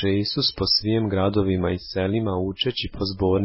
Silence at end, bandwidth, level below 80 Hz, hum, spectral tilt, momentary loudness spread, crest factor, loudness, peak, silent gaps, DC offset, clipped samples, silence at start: 0 s; 5.8 kHz; -40 dBFS; none; -9 dB/octave; 6 LU; 14 dB; -23 LUFS; -8 dBFS; none; under 0.1%; under 0.1%; 0 s